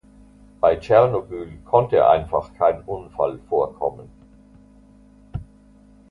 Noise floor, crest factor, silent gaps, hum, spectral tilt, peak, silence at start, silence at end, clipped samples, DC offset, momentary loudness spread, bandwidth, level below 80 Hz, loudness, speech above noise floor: -50 dBFS; 20 dB; none; none; -8 dB/octave; -2 dBFS; 0.65 s; 0.7 s; under 0.1%; under 0.1%; 18 LU; 7.2 kHz; -46 dBFS; -20 LUFS; 31 dB